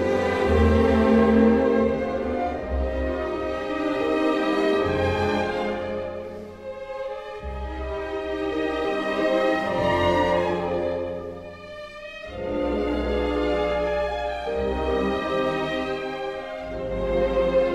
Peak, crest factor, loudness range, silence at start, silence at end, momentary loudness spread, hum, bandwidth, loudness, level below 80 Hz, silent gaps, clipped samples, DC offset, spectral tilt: -6 dBFS; 18 dB; 6 LU; 0 s; 0 s; 15 LU; none; 12 kHz; -24 LUFS; -36 dBFS; none; under 0.1%; under 0.1%; -7 dB/octave